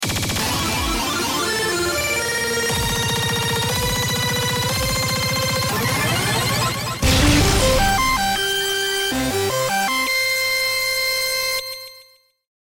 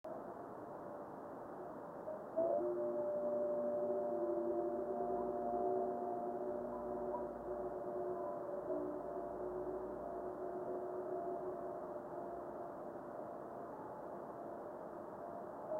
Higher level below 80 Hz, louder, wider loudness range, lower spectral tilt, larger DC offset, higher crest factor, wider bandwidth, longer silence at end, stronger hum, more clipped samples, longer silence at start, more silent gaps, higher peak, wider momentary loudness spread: first, -32 dBFS vs -72 dBFS; first, -19 LUFS vs -43 LUFS; second, 2 LU vs 8 LU; second, -3 dB/octave vs -9 dB/octave; neither; about the same, 14 dB vs 16 dB; first, 17 kHz vs 4.1 kHz; first, 0.6 s vs 0 s; neither; neither; about the same, 0 s vs 0.05 s; neither; first, -6 dBFS vs -26 dBFS; second, 4 LU vs 11 LU